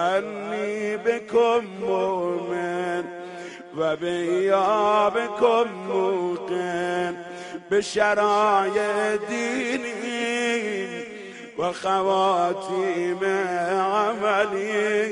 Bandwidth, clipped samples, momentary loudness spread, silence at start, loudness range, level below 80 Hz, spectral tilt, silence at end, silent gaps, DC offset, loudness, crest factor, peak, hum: 10.5 kHz; under 0.1%; 10 LU; 0 s; 3 LU; -68 dBFS; -4.5 dB/octave; 0 s; none; under 0.1%; -23 LUFS; 18 dB; -4 dBFS; none